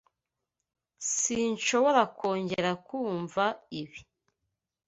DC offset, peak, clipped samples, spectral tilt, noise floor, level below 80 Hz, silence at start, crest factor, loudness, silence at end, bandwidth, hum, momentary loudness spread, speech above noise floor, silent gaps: under 0.1%; -10 dBFS; under 0.1%; -3 dB/octave; -87 dBFS; -70 dBFS; 1 s; 20 dB; -28 LUFS; 0.85 s; 8.2 kHz; none; 15 LU; 58 dB; none